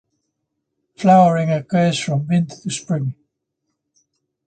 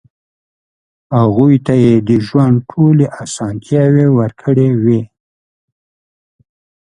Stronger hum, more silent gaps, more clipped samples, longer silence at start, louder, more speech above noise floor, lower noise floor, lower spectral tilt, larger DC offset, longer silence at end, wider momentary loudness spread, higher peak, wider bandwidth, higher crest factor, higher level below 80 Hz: neither; neither; neither; about the same, 1 s vs 1.1 s; second, -18 LUFS vs -12 LUFS; second, 59 dB vs over 79 dB; second, -76 dBFS vs under -90 dBFS; second, -6.5 dB/octave vs -8 dB/octave; neither; second, 1.35 s vs 1.8 s; first, 12 LU vs 8 LU; about the same, 0 dBFS vs 0 dBFS; second, 9.2 kHz vs 10.5 kHz; first, 20 dB vs 14 dB; second, -62 dBFS vs -48 dBFS